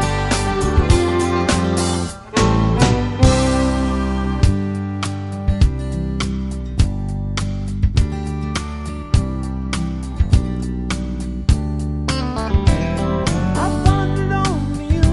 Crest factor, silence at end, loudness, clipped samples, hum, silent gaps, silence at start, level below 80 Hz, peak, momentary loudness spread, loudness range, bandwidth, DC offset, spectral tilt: 16 dB; 0 s; -19 LUFS; under 0.1%; none; none; 0 s; -22 dBFS; -2 dBFS; 8 LU; 5 LU; 11.5 kHz; under 0.1%; -6 dB/octave